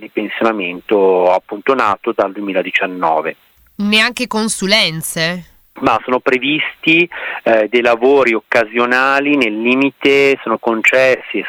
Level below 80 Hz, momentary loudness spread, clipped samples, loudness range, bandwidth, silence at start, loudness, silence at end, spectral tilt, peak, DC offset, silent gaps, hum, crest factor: -54 dBFS; 7 LU; under 0.1%; 3 LU; 18.5 kHz; 0 s; -14 LUFS; 0 s; -3.5 dB/octave; 0 dBFS; under 0.1%; none; none; 14 dB